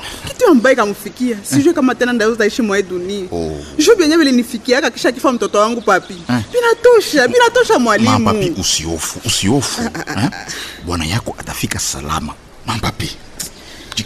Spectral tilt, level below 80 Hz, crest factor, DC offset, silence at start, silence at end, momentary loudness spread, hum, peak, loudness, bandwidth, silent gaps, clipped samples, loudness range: -4 dB/octave; -38 dBFS; 14 dB; under 0.1%; 0 s; 0 s; 14 LU; none; -2 dBFS; -14 LUFS; 14 kHz; none; under 0.1%; 8 LU